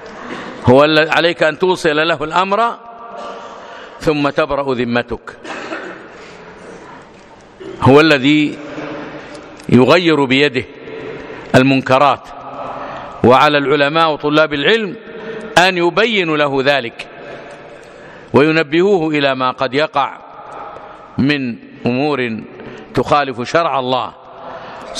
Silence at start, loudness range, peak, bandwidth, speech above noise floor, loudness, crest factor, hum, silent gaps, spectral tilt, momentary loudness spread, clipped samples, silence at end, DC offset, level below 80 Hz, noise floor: 0 s; 7 LU; 0 dBFS; 13.5 kHz; 27 dB; -13 LUFS; 16 dB; none; none; -5.5 dB/octave; 22 LU; 0.2%; 0 s; under 0.1%; -48 dBFS; -40 dBFS